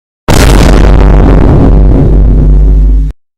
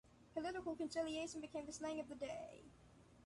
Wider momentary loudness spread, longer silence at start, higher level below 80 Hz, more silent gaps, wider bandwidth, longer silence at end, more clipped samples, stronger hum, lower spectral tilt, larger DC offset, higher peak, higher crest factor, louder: second, 4 LU vs 19 LU; first, 0.3 s vs 0.05 s; first, -4 dBFS vs -72 dBFS; neither; first, 13.5 kHz vs 11.5 kHz; first, 0.25 s vs 0 s; first, 0.4% vs under 0.1%; second, none vs 60 Hz at -65 dBFS; first, -6.5 dB/octave vs -4 dB/octave; neither; first, 0 dBFS vs -32 dBFS; second, 2 dB vs 16 dB; first, -6 LUFS vs -47 LUFS